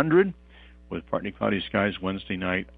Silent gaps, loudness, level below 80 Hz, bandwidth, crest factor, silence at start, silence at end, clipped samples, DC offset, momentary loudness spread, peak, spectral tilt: none; -27 LUFS; -52 dBFS; 4.7 kHz; 20 dB; 0 s; 0.05 s; under 0.1%; under 0.1%; 14 LU; -6 dBFS; -9.5 dB/octave